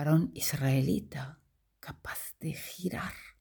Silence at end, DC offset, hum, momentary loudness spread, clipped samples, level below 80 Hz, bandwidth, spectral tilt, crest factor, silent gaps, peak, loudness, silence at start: 0.1 s; under 0.1%; none; 16 LU; under 0.1%; -58 dBFS; over 20 kHz; -5.5 dB/octave; 18 dB; none; -16 dBFS; -33 LUFS; 0 s